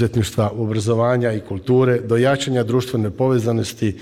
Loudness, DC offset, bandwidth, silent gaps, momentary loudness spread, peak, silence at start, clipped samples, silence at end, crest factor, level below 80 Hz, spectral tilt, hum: -19 LUFS; under 0.1%; 15 kHz; none; 5 LU; -6 dBFS; 0 s; under 0.1%; 0 s; 12 dB; -48 dBFS; -6.5 dB/octave; none